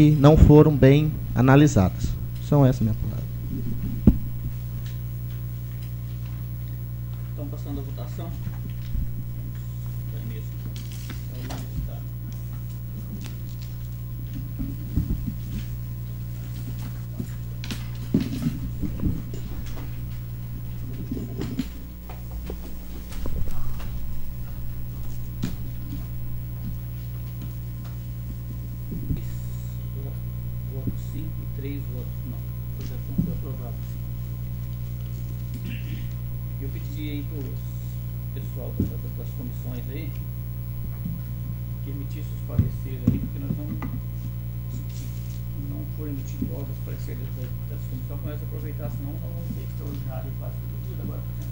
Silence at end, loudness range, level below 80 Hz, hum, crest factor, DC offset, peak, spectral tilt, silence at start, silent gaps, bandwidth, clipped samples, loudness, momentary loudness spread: 0 s; 8 LU; -34 dBFS; 60 Hz at -30 dBFS; 24 dB; under 0.1%; -2 dBFS; -8 dB/octave; 0 s; none; 16.5 kHz; under 0.1%; -28 LUFS; 10 LU